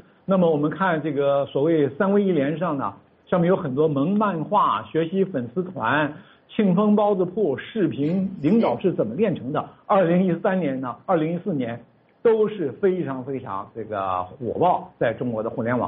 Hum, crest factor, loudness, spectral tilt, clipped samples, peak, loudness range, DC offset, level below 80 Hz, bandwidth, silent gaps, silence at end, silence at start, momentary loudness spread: none; 14 dB; -23 LUFS; -6.5 dB/octave; under 0.1%; -8 dBFS; 3 LU; under 0.1%; -62 dBFS; 4.5 kHz; none; 0 s; 0.3 s; 9 LU